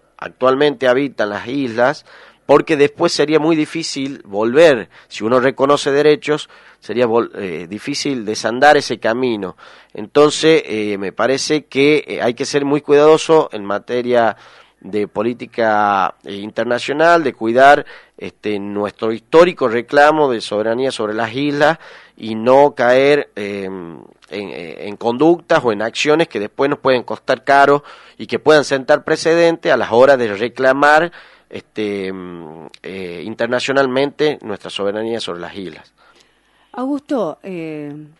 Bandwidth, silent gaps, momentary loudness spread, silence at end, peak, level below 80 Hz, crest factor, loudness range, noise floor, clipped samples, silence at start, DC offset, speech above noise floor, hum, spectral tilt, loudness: 11.5 kHz; none; 17 LU; 0.15 s; 0 dBFS; -58 dBFS; 16 dB; 6 LU; -56 dBFS; under 0.1%; 0.2 s; under 0.1%; 40 dB; none; -4.5 dB/octave; -15 LUFS